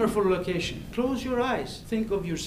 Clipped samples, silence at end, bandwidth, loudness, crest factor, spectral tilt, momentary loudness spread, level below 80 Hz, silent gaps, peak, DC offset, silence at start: under 0.1%; 0 s; 15.5 kHz; -28 LUFS; 14 dB; -5.5 dB/octave; 6 LU; -46 dBFS; none; -12 dBFS; under 0.1%; 0 s